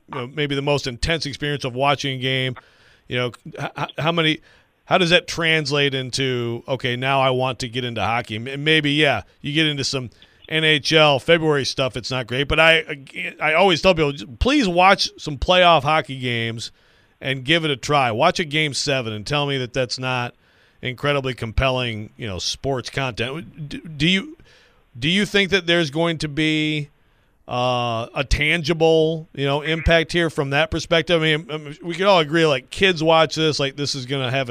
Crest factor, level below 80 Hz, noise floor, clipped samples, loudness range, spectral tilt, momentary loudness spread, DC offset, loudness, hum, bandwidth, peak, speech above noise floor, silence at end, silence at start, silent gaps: 20 dB; -38 dBFS; -58 dBFS; under 0.1%; 6 LU; -4.5 dB/octave; 12 LU; under 0.1%; -19 LUFS; none; 15 kHz; -2 dBFS; 38 dB; 0 s; 0.1 s; none